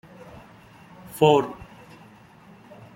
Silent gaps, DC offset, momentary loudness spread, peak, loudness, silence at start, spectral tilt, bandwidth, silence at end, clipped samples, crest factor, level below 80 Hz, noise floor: none; under 0.1%; 27 LU; -4 dBFS; -21 LUFS; 1.15 s; -6 dB/octave; 16.5 kHz; 1.4 s; under 0.1%; 24 dB; -60 dBFS; -50 dBFS